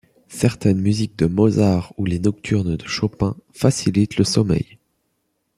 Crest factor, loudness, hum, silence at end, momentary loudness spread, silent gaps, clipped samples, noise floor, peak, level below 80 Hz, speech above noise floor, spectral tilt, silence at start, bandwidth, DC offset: 18 dB; -20 LUFS; none; 0.95 s; 7 LU; none; under 0.1%; -71 dBFS; -2 dBFS; -46 dBFS; 52 dB; -6.5 dB/octave; 0.3 s; 13.5 kHz; under 0.1%